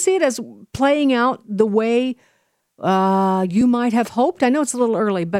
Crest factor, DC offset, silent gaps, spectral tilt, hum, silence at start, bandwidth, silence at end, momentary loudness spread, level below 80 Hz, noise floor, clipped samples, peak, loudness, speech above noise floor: 16 dB; under 0.1%; none; -5 dB/octave; none; 0 s; 15 kHz; 0 s; 7 LU; -56 dBFS; -54 dBFS; under 0.1%; -2 dBFS; -18 LUFS; 36 dB